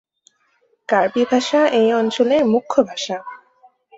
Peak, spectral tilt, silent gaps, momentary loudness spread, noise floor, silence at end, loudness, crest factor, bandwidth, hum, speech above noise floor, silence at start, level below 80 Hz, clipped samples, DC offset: -2 dBFS; -4.5 dB/octave; none; 12 LU; -63 dBFS; 0.6 s; -17 LUFS; 16 dB; 8 kHz; none; 46 dB; 0.9 s; -64 dBFS; under 0.1%; under 0.1%